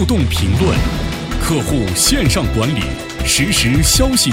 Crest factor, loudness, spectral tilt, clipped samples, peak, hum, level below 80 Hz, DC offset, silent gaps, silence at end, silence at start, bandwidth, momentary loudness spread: 14 dB; -15 LUFS; -4 dB/octave; under 0.1%; 0 dBFS; none; -22 dBFS; under 0.1%; none; 0 s; 0 s; 16 kHz; 9 LU